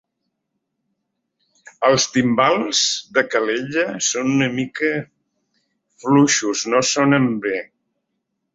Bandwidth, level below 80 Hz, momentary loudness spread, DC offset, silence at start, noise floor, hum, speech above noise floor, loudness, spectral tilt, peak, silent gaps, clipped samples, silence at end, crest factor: 8 kHz; -62 dBFS; 6 LU; under 0.1%; 1.8 s; -76 dBFS; none; 58 dB; -18 LUFS; -3.5 dB/octave; -2 dBFS; none; under 0.1%; 0.9 s; 18 dB